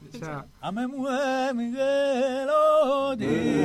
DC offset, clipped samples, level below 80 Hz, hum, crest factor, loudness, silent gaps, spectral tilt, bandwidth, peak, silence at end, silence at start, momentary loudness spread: under 0.1%; under 0.1%; -58 dBFS; none; 12 dB; -25 LUFS; none; -5.5 dB/octave; 13 kHz; -12 dBFS; 0 s; 0 s; 15 LU